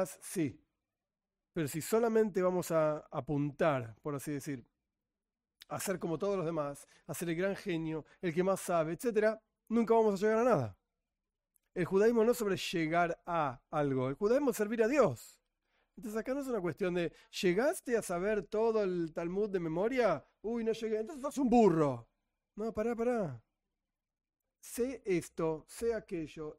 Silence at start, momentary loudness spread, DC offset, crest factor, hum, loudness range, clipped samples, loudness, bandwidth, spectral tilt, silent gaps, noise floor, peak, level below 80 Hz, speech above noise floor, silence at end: 0 s; 12 LU; under 0.1%; 18 dB; none; 6 LU; under 0.1%; -33 LUFS; 16 kHz; -6 dB/octave; none; under -90 dBFS; -16 dBFS; -64 dBFS; over 57 dB; 0.05 s